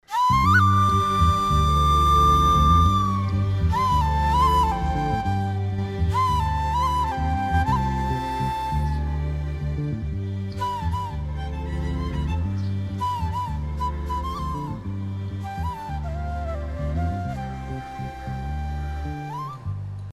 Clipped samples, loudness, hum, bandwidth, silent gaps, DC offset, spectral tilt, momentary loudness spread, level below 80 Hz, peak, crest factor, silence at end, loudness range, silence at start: under 0.1%; -23 LUFS; none; 14.5 kHz; none; under 0.1%; -6 dB/octave; 14 LU; -30 dBFS; -6 dBFS; 16 dB; 0 s; 11 LU; 0.1 s